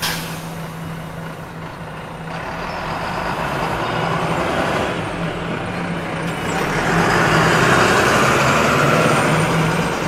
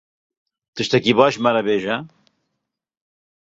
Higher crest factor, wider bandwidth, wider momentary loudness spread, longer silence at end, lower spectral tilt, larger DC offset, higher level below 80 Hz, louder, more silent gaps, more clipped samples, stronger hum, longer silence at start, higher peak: about the same, 16 dB vs 20 dB; first, 16 kHz vs 8 kHz; first, 16 LU vs 12 LU; second, 0 s vs 1.35 s; about the same, -4.5 dB/octave vs -5 dB/octave; neither; first, -40 dBFS vs -62 dBFS; about the same, -18 LUFS vs -18 LUFS; neither; neither; neither; second, 0 s vs 0.75 s; about the same, -2 dBFS vs -2 dBFS